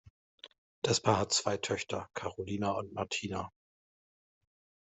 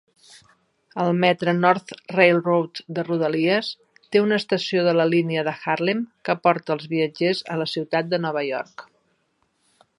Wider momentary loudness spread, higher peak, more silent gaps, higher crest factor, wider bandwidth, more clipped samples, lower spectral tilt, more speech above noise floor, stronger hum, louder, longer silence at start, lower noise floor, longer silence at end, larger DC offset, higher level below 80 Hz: about the same, 11 LU vs 9 LU; second, -12 dBFS vs -2 dBFS; first, 0.10-0.38 s, 0.58-0.82 s vs none; about the same, 24 dB vs 20 dB; second, 8.2 kHz vs 11 kHz; neither; second, -3.5 dB/octave vs -6.5 dB/octave; first, over 56 dB vs 47 dB; neither; second, -33 LUFS vs -22 LUFS; second, 0.05 s vs 0.95 s; first, under -90 dBFS vs -69 dBFS; first, 1.3 s vs 1.15 s; neither; about the same, -70 dBFS vs -72 dBFS